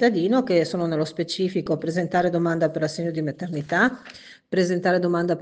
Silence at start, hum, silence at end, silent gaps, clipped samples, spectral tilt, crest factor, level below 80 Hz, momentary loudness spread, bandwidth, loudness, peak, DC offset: 0 s; none; 0 s; none; under 0.1%; -6 dB/octave; 16 dB; -64 dBFS; 7 LU; 9.4 kHz; -23 LUFS; -6 dBFS; under 0.1%